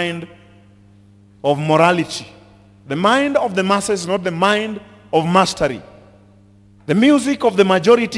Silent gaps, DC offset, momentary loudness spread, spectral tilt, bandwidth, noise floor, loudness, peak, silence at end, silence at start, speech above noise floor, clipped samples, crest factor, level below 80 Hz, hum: none; under 0.1%; 14 LU; -5 dB/octave; 12 kHz; -48 dBFS; -16 LUFS; 0 dBFS; 0 s; 0 s; 32 dB; under 0.1%; 18 dB; -54 dBFS; none